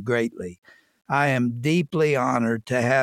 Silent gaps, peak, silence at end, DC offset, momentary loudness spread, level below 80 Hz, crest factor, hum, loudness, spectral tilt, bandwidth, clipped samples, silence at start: 0.58-0.62 s; -8 dBFS; 0 s; under 0.1%; 8 LU; -64 dBFS; 16 dB; none; -23 LUFS; -6.5 dB/octave; 15.5 kHz; under 0.1%; 0 s